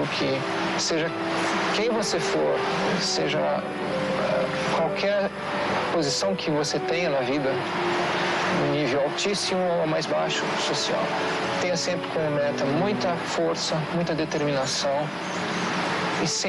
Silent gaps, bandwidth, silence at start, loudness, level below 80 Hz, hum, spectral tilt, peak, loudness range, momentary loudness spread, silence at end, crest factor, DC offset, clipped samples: none; 12.5 kHz; 0 s; -25 LUFS; -58 dBFS; none; -4 dB/octave; -14 dBFS; 1 LU; 3 LU; 0 s; 10 dB; under 0.1%; under 0.1%